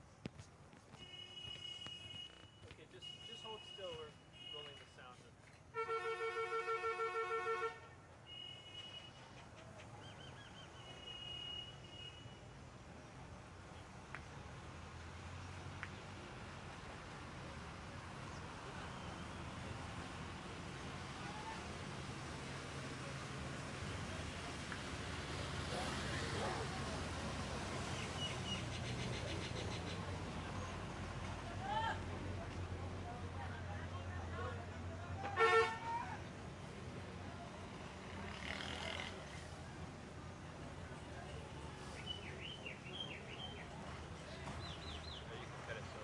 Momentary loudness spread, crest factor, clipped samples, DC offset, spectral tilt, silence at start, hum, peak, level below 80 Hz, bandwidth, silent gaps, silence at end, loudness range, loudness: 13 LU; 26 dB; under 0.1%; under 0.1%; -4.5 dB/octave; 0 s; none; -20 dBFS; -62 dBFS; 11.5 kHz; none; 0 s; 11 LU; -46 LUFS